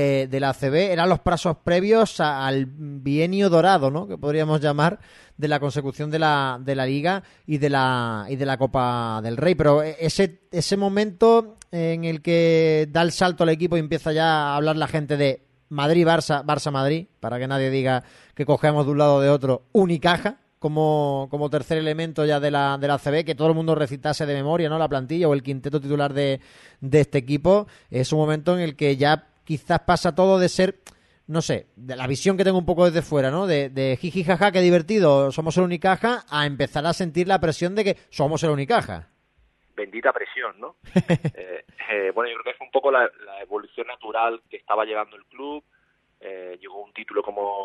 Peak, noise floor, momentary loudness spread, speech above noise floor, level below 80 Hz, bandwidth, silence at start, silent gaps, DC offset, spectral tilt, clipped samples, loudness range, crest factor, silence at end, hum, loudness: -4 dBFS; -63 dBFS; 13 LU; 42 dB; -50 dBFS; 12 kHz; 0 s; none; under 0.1%; -6 dB/octave; under 0.1%; 5 LU; 18 dB; 0 s; none; -22 LUFS